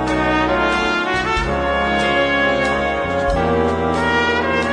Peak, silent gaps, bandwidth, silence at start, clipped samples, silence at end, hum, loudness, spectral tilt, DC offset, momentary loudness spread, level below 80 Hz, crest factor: -4 dBFS; none; 10 kHz; 0 s; under 0.1%; 0 s; none; -17 LUFS; -5 dB/octave; under 0.1%; 3 LU; -32 dBFS; 14 dB